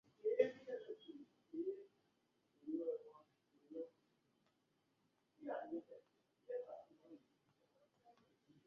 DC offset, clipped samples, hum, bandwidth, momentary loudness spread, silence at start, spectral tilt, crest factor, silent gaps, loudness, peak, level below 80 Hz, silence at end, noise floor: under 0.1%; under 0.1%; none; 6.6 kHz; 24 LU; 0.25 s; -4.5 dB/octave; 28 dB; none; -47 LUFS; -22 dBFS; under -90 dBFS; 0.55 s; -83 dBFS